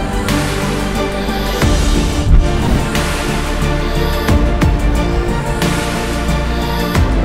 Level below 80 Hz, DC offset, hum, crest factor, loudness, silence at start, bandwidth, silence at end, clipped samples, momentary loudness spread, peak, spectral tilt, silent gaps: -16 dBFS; 0.9%; none; 14 dB; -16 LUFS; 0 s; 16 kHz; 0 s; under 0.1%; 4 LU; 0 dBFS; -5.5 dB/octave; none